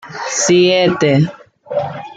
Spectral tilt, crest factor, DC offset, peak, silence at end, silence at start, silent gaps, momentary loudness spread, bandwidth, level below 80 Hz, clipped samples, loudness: -4.5 dB/octave; 12 dB; under 0.1%; -2 dBFS; 0.05 s; 0.05 s; none; 11 LU; 9.4 kHz; -56 dBFS; under 0.1%; -14 LUFS